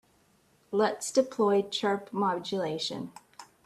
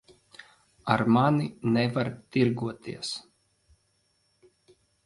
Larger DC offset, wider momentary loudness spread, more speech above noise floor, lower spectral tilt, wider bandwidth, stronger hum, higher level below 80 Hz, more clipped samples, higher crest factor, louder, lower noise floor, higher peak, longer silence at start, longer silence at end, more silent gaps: neither; second, 10 LU vs 13 LU; second, 37 dB vs 45 dB; second, -4 dB/octave vs -6.5 dB/octave; first, 13.5 kHz vs 11.5 kHz; neither; second, -74 dBFS vs -64 dBFS; neither; about the same, 20 dB vs 22 dB; about the same, -29 LUFS vs -27 LUFS; second, -66 dBFS vs -71 dBFS; second, -12 dBFS vs -6 dBFS; second, 0.7 s vs 0.85 s; second, 0.2 s vs 1.85 s; neither